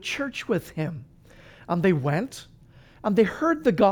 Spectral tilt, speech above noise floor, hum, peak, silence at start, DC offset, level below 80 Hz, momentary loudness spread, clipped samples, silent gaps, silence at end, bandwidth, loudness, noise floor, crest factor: -6.5 dB/octave; 28 dB; none; -8 dBFS; 0 s; under 0.1%; -56 dBFS; 11 LU; under 0.1%; none; 0 s; over 20 kHz; -25 LUFS; -52 dBFS; 18 dB